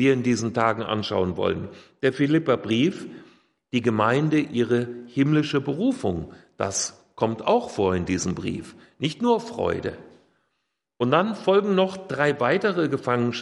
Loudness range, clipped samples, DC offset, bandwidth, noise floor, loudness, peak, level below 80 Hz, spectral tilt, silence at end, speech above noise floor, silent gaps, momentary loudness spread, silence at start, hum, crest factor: 3 LU; under 0.1%; under 0.1%; 11.5 kHz; -78 dBFS; -24 LUFS; -4 dBFS; -60 dBFS; -5.5 dB/octave; 0 s; 55 dB; none; 9 LU; 0 s; none; 18 dB